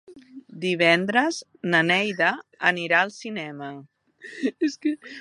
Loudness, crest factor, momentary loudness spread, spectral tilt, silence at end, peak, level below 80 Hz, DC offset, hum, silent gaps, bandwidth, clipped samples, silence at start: -23 LUFS; 22 dB; 15 LU; -4.5 dB/octave; 0 s; -4 dBFS; -76 dBFS; under 0.1%; none; none; 11.5 kHz; under 0.1%; 0.1 s